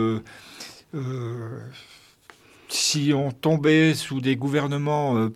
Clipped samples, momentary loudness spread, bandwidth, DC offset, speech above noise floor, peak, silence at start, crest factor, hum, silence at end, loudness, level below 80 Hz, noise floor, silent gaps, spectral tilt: under 0.1%; 21 LU; 15 kHz; under 0.1%; 29 dB; -8 dBFS; 0 s; 18 dB; none; 0 s; -23 LUFS; -66 dBFS; -53 dBFS; none; -5 dB/octave